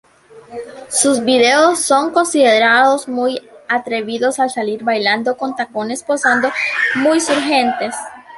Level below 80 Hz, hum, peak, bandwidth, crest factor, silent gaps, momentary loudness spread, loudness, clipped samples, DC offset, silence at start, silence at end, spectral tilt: -62 dBFS; none; 0 dBFS; 12 kHz; 16 dB; none; 11 LU; -15 LUFS; under 0.1%; under 0.1%; 0.35 s; 0 s; -2 dB/octave